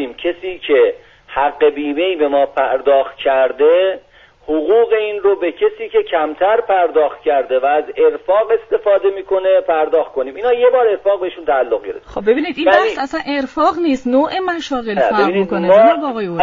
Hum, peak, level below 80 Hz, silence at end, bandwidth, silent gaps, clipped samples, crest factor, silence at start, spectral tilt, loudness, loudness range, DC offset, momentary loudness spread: none; 0 dBFS; -50 dBFS; 0 s; 7.4 kHz; none; under 0.1%; 14 dB; 0 s; -2.5 dB/octave; -15 LUFS; 1 LU; under 0.1%; 8 LU